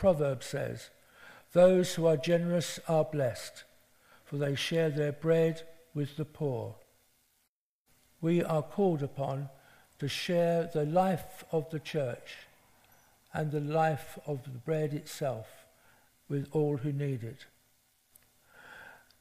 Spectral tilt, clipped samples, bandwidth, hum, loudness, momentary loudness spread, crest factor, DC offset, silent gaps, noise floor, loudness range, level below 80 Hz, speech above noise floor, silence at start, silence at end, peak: -6 dB/octave; under 0.1%; 15.5 kHz; none; -32 LUFS; 17 LU; 20 dB; under 0.1%; 7.48-7.85 s; -79 dBFS; 7 LU; -64 dBFS; 48 dB; 0 s; 0.25 s; -12 dBFS